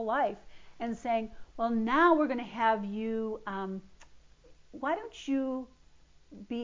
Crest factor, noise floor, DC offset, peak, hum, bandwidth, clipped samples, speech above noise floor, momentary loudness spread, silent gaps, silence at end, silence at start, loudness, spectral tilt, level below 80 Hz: 20 dB; -59 dBFS; under 0.1%; -12 dBFS; none; 7.6 kHz; under 0.1%; 28 dB; 19 LU; none; 0 s; 0 s; -31 LUFS; -6 dB/octave; -62 dBFS